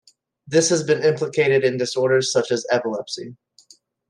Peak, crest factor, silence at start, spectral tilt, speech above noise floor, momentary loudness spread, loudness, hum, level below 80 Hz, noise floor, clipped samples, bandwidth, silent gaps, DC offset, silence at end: -4 dBFS; 16 dB; 0.45 s; -4 dB/octave; 35 dB; 10 LU; -20 LUFS; none; -70 dBFS; -54 dBFS; under 0.1%; 11.5 kHz; none; under 0.1%; 0.75 s